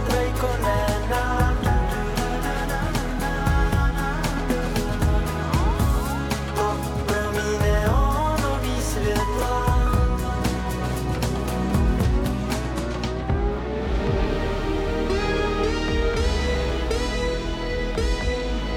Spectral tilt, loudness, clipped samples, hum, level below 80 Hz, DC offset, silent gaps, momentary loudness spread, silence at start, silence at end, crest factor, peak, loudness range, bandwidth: -5.5 dB/octave; -24 LUFS; under 0.1%; none; -26 dBFS; under 0.1%; none; 5 LU; 0 s; 0 s; 12 dB; -10 dBFS; 2 LU; 17.5 kHz